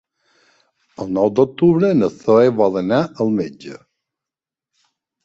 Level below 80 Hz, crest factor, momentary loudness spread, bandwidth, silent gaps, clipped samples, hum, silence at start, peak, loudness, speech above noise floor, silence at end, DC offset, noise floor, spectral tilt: -56 dBFS; 16 dB; 15 LU; 7.8 kHz; none; under 0.1%; none; 1 s; -2 dBFS; -16 LUFS; 72 dB; 1.5 s; under 0.1%; -88 dBFS; -8 dB/octave